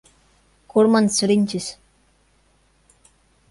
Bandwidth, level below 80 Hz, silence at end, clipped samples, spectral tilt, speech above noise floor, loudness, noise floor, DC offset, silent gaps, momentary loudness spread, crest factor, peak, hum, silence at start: 11.5 kHz; -60 dBFS; 1.8 s; under 0.1%; -4.5 dB/octave; 43 dB; -19 LUFS; -60 dBFS; under 0.1%; none; 12 LU; 18 dB; -4 dBFS; none; 0.75 s